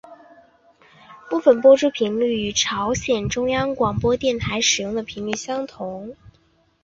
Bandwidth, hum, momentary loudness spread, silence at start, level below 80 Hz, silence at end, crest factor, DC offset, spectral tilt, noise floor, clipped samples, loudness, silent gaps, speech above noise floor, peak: 7.8 kHz; none; 13 LU; 0.1 s; -46 dBFS; 0.7 s; 18 dB; under 0.1%; -3.5 dB/octave; -60 dBFS; under 0.1%; -20 LUFS; none; 40 dB; -2 dBFS